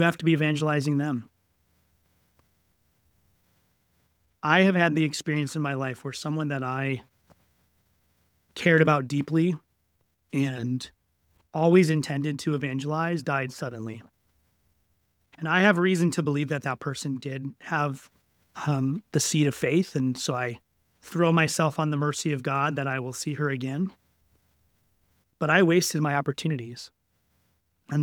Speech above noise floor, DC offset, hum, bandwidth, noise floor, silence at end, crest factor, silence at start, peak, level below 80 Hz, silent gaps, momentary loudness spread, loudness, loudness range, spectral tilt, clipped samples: 47 dB; under 0.1%; none; 18 kHz; -72 dBFS; 0 s; 22 dB; 0 s; -4 dBFS; -68 dBFS; none; 14 LU; -26 LUFS; 5 LU; -5.5 dB/octave; under 0.1%